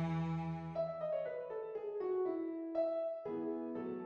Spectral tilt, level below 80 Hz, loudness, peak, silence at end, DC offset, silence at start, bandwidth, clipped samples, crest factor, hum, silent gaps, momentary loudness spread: -9.5 dB/octave; -70 dBFS; -40 LUFS; -26 dBFS; 0 s; under 0.1%; 0 s; 6.8 kHz; under 0.1%; 12 dB; none; none; 5 LU